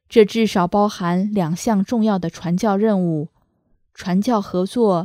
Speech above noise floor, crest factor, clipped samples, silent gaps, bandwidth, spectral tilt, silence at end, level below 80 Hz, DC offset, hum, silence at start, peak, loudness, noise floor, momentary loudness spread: 45 dB; 18 dB; under 0.1%; none; 15 kHz; -6.5 dB/octave; 0 s; -54 dBFS; under 0.1%; none; 0.1 s; 0 dBFS; -19 LUFS; -63 dBFS; 6 LU